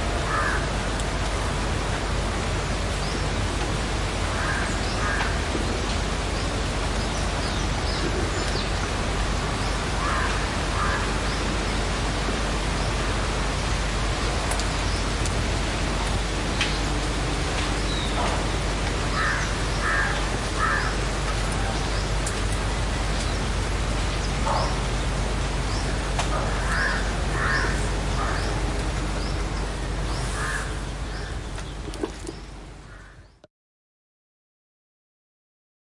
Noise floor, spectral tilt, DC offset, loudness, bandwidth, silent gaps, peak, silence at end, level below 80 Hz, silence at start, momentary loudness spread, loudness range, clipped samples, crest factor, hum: -47 dBFS; -4 dB/octave; under 0.1%; -26 LUFS; 11.5 kHz; none; -8 dBFS; 2.7 s; -30 dBFS; 0 s; 4 LU; 5 LU; under 0.1%; 16 dB; none